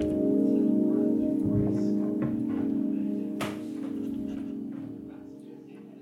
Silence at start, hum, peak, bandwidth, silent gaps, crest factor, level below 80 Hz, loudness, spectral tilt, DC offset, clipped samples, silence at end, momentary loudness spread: 0 s; none; -14 dBFS; 13 kHz; none; 14 dB; -56 dBFS; -28 LUFS; -8.5 dB/octave; under 0.1%; under 0.1%; 0 s; 19 LU